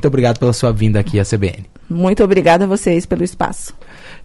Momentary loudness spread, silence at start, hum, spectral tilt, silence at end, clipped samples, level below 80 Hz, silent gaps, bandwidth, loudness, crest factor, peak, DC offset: 11 LU; 0 s; none; -6.5 dB/octave; 0 s; under 0.1%; -34 dBFS; none; 11.5 kHz; -15 LUFS; 14 dB; -2 dBFS; under 0.1%